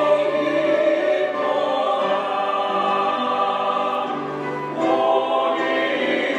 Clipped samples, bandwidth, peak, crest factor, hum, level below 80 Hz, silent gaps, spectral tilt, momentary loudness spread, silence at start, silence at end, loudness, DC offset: under 0.1%; 9.4 kHz; -6 dBFS; 14 dB; none; -72 dBFS; none; -5 dB/octave; 5 LU; 0 s; 0 s; -21 LUFS; under 0.1%